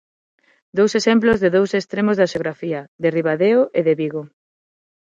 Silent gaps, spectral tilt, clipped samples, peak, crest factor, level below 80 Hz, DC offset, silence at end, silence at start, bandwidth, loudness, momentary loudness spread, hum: 2.88-2.99 s; -6 dB/octave; under 0.1%; -2 dBFS; 16 dB; -54 dBFS; under 0.1%; 0.8 s; 0.75 s; 7.8 kHz; -18 LUFS; 11 LU; none